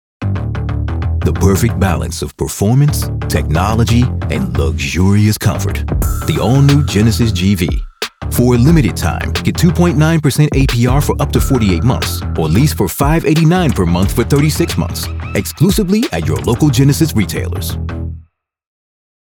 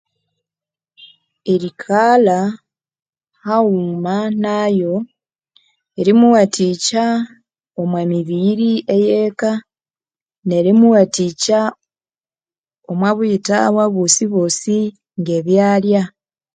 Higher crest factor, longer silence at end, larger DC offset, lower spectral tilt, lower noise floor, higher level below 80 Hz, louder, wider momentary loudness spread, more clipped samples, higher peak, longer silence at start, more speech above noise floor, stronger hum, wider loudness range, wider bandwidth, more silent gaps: about the same, 12 dB vs 16 dB; first, 1.05 s vs 0.45 s; neither; about the same, -6 dB/octave vs -5 dB/octave; second, -42 dBFS vs under -90 dBFS; first, -24 dBFS vs -64 dBFS; about the same, -13 LUFS vs -15 LUFS; second, 9 LU vs 13 LU; neither; about the same, 0 dBFS vs 0 dBFS; second, 0.2 s vs 1 s; second, 30 dB vs over 76 dB; neither; about the same, 2 LU vs 3 LU; first, 19.5 kHz vs 9.6 kHz; second, none vs 10.22-10.26 s, 10.38-10.42 s, 12.59-12.64 s